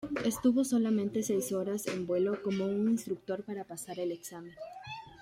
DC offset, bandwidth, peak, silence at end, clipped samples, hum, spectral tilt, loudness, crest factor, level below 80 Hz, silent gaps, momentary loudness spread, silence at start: under 0.1%; 16.5 kHz; -16 dBFS; 0 s; under 0.1%; none; -5.5 dB/octave; -32 LUFS; 16 dB; -68 dBFS; none; 16 LU; 0 s